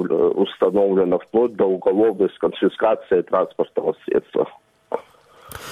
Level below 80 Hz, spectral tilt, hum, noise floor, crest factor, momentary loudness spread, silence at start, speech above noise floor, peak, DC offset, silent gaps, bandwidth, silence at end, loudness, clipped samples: -58 dBFS; -7 dB/octave; none; -48 dBFS; 14 dB; 13 LU; 0 s; 29 dB; -6 dBFS; under 0.1%; none; 15 kHz; 0 s; -20 LUFS; under 0.1%